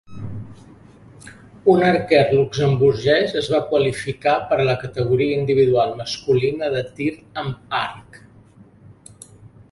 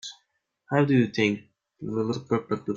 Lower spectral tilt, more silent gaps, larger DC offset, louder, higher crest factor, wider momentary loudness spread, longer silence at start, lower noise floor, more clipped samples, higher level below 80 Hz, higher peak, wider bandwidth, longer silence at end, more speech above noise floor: about the same, -6.5 dB/octave vs -6.5 dB/octave; neither; neither; first, -19 LUFS vs -26 LUFS; about the same, 18 dB vs 18 dB; about the same, 13 LU vs 14 LU; about the same, 0.1 s vs 0.05 s; second, -48 dBFS vs -74 dBFS; neither; first, -50 dBFS vs -64 dBFS; first, -2 dBFS vs -8 dBFS; first, 11.5 kHz vs 7.8 kHz; first, 0.25 s vs 0 s; second, 29 dB vs 49 dB